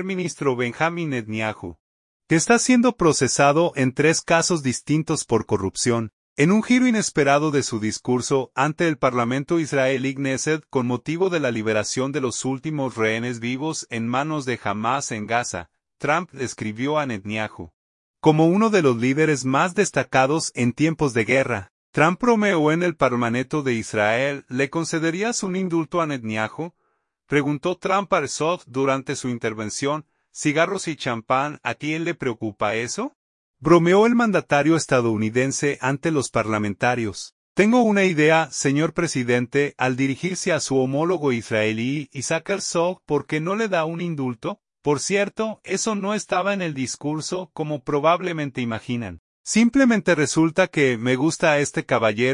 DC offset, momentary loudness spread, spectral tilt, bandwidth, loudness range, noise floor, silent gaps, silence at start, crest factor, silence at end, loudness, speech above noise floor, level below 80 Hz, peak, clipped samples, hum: under 0.1%; 9 LU; -5 dB/octave; 11 kHz; 5 LU; -70 dBFS; 1.80-2.20 s, 6.13-6.36 s, 17.73-18.14 s, 21.70-21.93 s, 33.15-33.54 s, 37.32-37.55 s, 49.19-49.44 s; 0 s; 18 dB; 0 s; -21 LUFS; 49 dB; -58 dBFS; -2 dBFS; under 0.1%; none